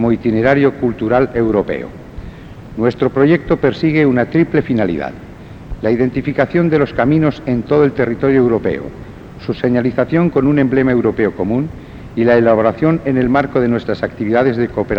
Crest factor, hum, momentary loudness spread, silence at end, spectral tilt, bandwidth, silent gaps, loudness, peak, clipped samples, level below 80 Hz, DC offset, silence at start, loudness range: 14 dB; none; 17 LU; 0 s; -9 dB/octave; 7 kHz; none; -15 LUFS; 0 dBFS; under 0.1%; -38 dBFS; 0.1%; 0 s; 2 LU